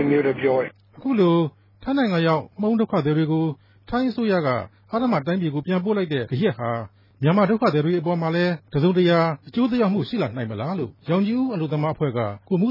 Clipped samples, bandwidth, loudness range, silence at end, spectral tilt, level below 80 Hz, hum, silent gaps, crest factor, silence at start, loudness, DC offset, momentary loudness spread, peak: under 0.1%; 5.8 kHz; 3 LU; 0 s; -9.5 dB/octave; -56 dBFS; none; none; 14 dB; 0 s; -22 LUFS; under 0.1%; 9 LU; -8 dBFS